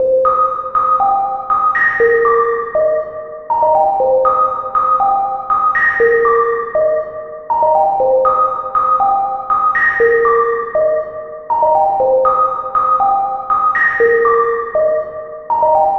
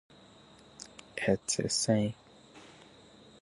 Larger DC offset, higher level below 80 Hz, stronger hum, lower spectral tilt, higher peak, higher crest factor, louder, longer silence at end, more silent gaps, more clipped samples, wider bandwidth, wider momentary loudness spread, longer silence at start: first, 0.1% vs under 0.1%; first, -48 dBFS vs -64 dBFS; neither; first, -6 dB/octave vs -4 dB/octave; first, -2 dBFS vs -14 dBFS; second, 12 dB vs 20 dB; first, -13 LUFS vs -31 LUFS; second, 0 s vs 0.7 s; neither; neither; second, 6 kHz vs 11.5 kHz; second, 7 LU vs 25 LU; second, 0 s vs 0.8 s